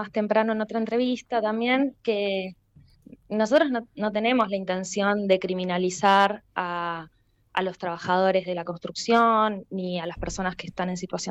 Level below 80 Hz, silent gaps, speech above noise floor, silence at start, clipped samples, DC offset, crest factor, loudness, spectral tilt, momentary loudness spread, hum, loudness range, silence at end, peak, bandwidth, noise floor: -54 dBFS; none; 29 dB; 0 s; under 0.1%; under 0.1%; 16 dB; -25 LUFS; -5 dB/octave; 11 LU; none; 2 LU; 0 s; -8 dBFS; 9.6 kHz; -54 dBFS